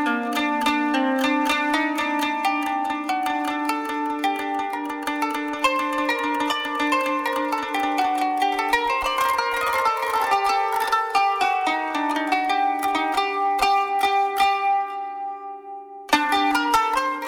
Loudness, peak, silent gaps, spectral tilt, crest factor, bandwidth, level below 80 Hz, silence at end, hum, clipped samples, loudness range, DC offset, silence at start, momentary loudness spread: -22 LUFS; -2 dBFS; none; -2 dB/octave; 20 dB; 18 kHz; -56 dBFS; 0 s; none; under 0.1%; 3 LU; under 0.1%; 0 s; 5 LU